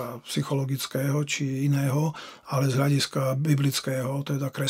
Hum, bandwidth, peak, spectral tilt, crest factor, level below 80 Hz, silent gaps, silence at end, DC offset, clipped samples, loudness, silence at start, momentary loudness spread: none; 16 kHz; -10 dBFS; -5.5 dB/octave; 16 dB; -68 dBFS; none; 0 s; under 0.1%; under 0.1%; -26 LUFS; 0 s; 7 LU